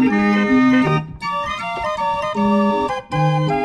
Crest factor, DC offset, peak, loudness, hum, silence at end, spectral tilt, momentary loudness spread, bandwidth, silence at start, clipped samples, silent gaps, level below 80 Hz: 12 dB; under 0.1%; -6 dBFS; -18 LUFS; none; 0 s; -7 dB/octave; 8 LU; 10 kHz; 0 s; under 0.1%; none; -44 dBFS